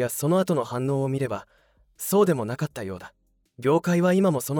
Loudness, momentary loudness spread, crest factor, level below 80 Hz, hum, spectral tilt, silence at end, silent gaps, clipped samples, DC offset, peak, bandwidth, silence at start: -24 LUFS; 13 LU; 16 dB; -64 dBFS; none; -6.5 dB/octave; 0 s; none; under 0.1%; under 0.1%; -8 dBFS; over 20 kHz; 0 s